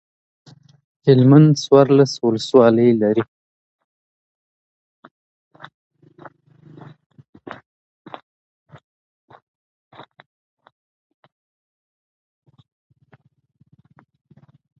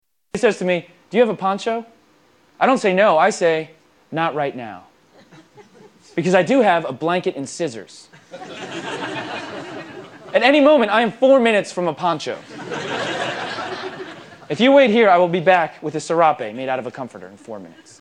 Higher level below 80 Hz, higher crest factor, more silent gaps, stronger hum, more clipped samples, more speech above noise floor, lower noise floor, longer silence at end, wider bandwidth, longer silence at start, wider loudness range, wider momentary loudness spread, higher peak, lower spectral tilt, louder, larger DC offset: first, -64 dBFS vs -70 dBFS; about the same, 20 dB vs 18 dB; neither; neither; neither; first, 43 dB vs 38 dB; about the same, -56 dBFS vs -56 dBFS; first, 11.55 s vs 0.3 s; second, 8.2 kHz vs 10.5 kHz; first, 1.05 s vs 0.35 s; first, 11 LU vs 6 LU; first, 28 LU vs 20 LU; about the same, 0 dBFS vs 0 dBFS; first, -7.5 dB/octave vs -5 dB/octave; first, -14 LUFS vs -18 LUFS; neither